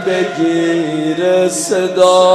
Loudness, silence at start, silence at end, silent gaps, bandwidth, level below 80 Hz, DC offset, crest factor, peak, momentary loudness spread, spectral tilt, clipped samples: -13 LUFS; 0 s; 0 s; none; 13.5 kHz; -64 dBFS; under 0.1%; 12 dB; 0 dBFS; 6 LU; -4 dB/octave; under 0.1%